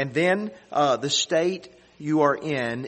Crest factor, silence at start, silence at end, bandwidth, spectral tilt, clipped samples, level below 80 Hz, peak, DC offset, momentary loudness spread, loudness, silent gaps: 18 dB; 0 s; 0 s; 8.8 kHz; -4 dB/octave; under 0.1%; -66 dBFS; -6 dBFS; under 0.1%; 7 LU; -23 LUFS; none